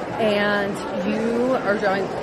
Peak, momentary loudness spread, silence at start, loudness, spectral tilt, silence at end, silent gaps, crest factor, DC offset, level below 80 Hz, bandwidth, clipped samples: -8 dBFS; 5 LU; 0 s; -22 LUFS; -5.5 dB/octave; 0 s; none; 14 dB; under 0.1%; -52 dBFS; 13 kHz; under 0.1%